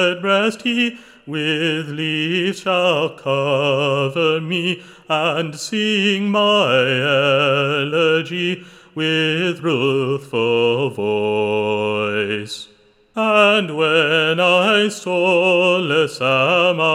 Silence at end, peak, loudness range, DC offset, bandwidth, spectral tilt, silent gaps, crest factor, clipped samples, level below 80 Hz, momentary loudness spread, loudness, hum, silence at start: 0 s; -2 dBFS; 4 LU; under 0.1%; 14 kHz; -5 dB/octave; none; 16 dB; under 0.1%; -68 dBFS; 8 LU; -17 LUFS; none; 0 s